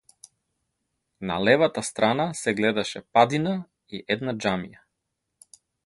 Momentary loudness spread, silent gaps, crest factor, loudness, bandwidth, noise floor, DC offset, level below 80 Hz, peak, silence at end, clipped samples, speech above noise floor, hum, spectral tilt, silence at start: 14 LU; none; 24 dB; -24 LUFS; 11.5 kHz; -80 dBFS; under 0.1%; -60 dBFS; -2 dBFS; 1.15 s; under 0.1%; 57 dB; none; -4.5 dB/octave; 1.2 s